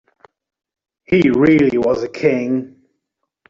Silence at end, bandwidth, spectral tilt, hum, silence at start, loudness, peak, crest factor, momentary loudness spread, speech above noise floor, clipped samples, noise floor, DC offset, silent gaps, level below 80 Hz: 0.8 s; 7.4 kHz; -8 dB/octave; none; 1.1 s; -15 LUFS; -2 dBFS; 14 dB; 8 LU; 61 dB; under 0.1%; -75 dBFS; under 0.1%; none; -50 dBFS